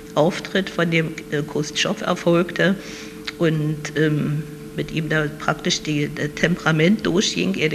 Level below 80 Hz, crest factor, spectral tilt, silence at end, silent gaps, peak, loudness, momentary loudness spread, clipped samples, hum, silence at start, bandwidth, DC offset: -48 dBFS; 20 dB; -5 dB/octave; 0 s; none; -2 dBFS; -21 LUFS; 9 LU; under 0.1%; none; 0 s; 14 kHz; under 0.1%